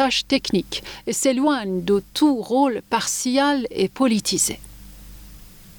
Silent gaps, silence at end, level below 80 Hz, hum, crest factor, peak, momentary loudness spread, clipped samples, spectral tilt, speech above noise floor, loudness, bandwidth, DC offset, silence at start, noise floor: none; 0.05 s; -48 dBFS; none; 16 dB; -6 dBFS; 5 LU; under 0.1%; -3.5 dB/octave; 22 dB; -21 LUFS; over 20 kHz; under 0.1%; 0 s; -43 dBFS